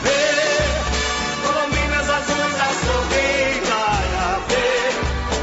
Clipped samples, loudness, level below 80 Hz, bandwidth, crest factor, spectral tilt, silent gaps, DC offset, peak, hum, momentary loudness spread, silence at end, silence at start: under 0.1%; -19 LUFS; -30 dBFS; 8 kHz; 14 dB; -3.5 dB/octave; none; under 0.1%; -6 dBFS; none; 4 LU; 0 s; 0 s